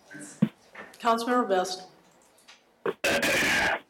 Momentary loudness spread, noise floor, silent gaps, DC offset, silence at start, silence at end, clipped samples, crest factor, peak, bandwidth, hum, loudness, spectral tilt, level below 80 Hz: 17 LU; -59 dBFS; none; under 0.1%; 0.1 s; 0.1 s; under 0.1%; 20 dB; -8 dBFS; 17 kHz; none; -26 LUFS; -3.5 dB/octave; -58 dBFS